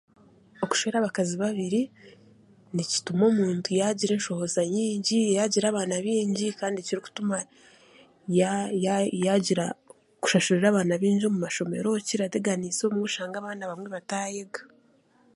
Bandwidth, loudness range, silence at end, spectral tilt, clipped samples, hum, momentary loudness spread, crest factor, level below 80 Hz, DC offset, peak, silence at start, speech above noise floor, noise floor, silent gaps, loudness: 11.5 kHz; 4 LU; 0.7 s; -4.5 dB/octave; under 0.1%; none; 11 LU; 18 dB; -72 dBFS; under 0.1%; -8 dBFS; 0.6 s; 36 dB; -62 dBFS; none; -26 LUFS